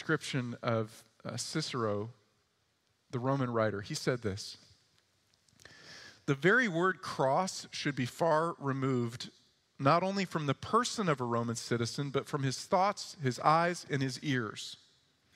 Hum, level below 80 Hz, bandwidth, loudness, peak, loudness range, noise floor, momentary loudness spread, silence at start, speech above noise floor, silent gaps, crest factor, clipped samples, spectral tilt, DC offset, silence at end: none; -74 dBFS; 15 kHz; -33 LUFS; -12 dBFS; 6 LU; -75 dBFS; 15 LU; 0 s; 43 dB; none; 22 dB; under 0.1%; -5 dB/octave; under 0.1%; 0.6 s